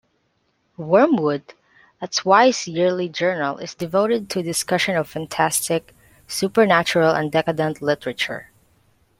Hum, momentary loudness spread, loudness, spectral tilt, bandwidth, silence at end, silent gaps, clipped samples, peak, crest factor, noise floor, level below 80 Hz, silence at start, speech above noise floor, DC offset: none; 10 LU; -20 LUFS; -4 dB/octave; 16.5 kHz; 0.75 s; none; under 0.1%; -2 dBFS; 20 dB; -67 dBFS; -62 dBFS; 0.8 s; 48 dB; under 0.1%